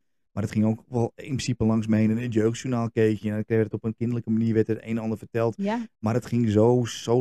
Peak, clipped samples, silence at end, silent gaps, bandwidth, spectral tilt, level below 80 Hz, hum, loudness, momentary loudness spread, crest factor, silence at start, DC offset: -8 dBFS; under 0.1%; 0 s; none; 12.5 kHz; -7 dB/octave; -56 dBFS; none; -25 LUFS; 7 LU; 16 dB; 0.35 s; 0.1%